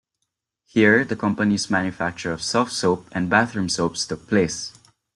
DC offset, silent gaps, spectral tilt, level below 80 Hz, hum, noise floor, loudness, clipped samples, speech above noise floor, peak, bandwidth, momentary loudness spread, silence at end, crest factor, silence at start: under 0.1%; none; -4.5 dB/octave; -56 dBFS; none; -79 dBFS; -21 LUFS; under 0.1%; 58 dB; -2 dBFS; 11.5 kHz; 10 LU; 0.45 s; 20 dB; 0.75 s